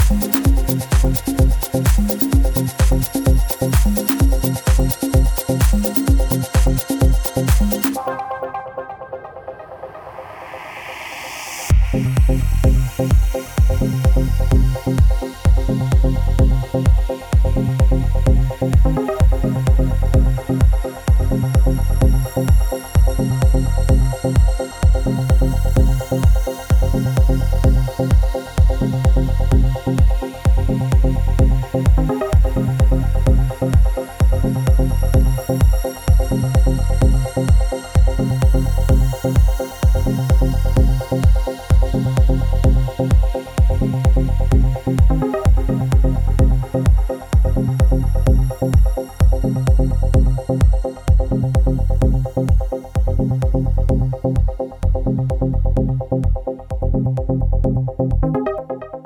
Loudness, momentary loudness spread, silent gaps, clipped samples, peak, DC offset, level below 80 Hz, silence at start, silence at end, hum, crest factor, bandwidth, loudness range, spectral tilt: -18 LUFS; 4 LU; none; under 0.1%; 0 dBFS; under 0.1%; -16 dBFS; 0 s; 0.05 s; none; 14 dB; over 20 kHz; 3 LU; -7 dB/octave